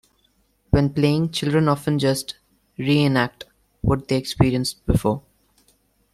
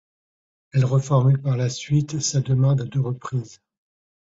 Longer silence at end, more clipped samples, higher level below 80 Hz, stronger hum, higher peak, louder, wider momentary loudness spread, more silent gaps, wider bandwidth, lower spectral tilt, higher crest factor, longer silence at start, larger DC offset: first, 0.95 s vs 0.7 s; neither; first, -38 dBFS vs -54 dBFS; neither; first, -2 dBFS vs -6 dBFS; about the same, -21 LUFS vs -22 LUFS; about the same, 10 LU vs 10 LU; neither; first, 14 kHz vs 7.8 kHz; about the same, -6 dB/octave vs -6 dB/octave; about the same, 20 dB vs 16 dB; about the same, 0.7 s vs 0.75 s; neither